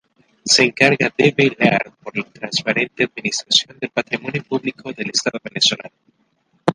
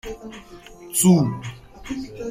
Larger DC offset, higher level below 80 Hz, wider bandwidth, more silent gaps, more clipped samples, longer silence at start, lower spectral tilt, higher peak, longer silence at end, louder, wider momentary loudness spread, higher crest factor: neither; second, -62 dBFS vs -48 dBFS; second, 11.5 kHz vs 16 kHz; neither; neither; first, 0.45 s vs 0.05 s; second, -3 dB/octave vs -5.5 dB/octave; first, 0 dBFS vs -4 dBFS; about the same, 0 s vs 0 s; about the same, -18 LUFS vs -20 LUFS; second, 13 LU vs 25 LU; about the same, 20 dB vs 20 dB